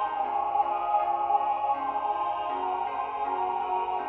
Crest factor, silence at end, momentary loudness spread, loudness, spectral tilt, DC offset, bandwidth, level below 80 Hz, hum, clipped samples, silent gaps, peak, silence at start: 16 dB; 0 s; 4 LU; -28 LUFS; -1.5 dB/octave; under 0.1%; 4 kHz; -64 dBFS; none; under 0.1%; none; -12 dBFS; 0 s